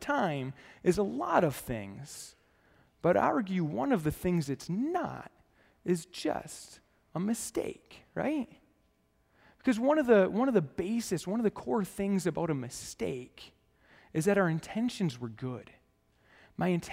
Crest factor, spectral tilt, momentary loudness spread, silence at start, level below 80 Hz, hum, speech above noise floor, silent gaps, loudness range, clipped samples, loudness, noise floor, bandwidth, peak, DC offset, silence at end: 22 dB; -6 dB/octave; 16 LU; 0 s; -60 dBFS; none; 40 dB; none; 7 LU; under 0.1%; -32 LUFS; -71 dBFS; 16 kHz; -10 dBFS; under 0.1%; 0 s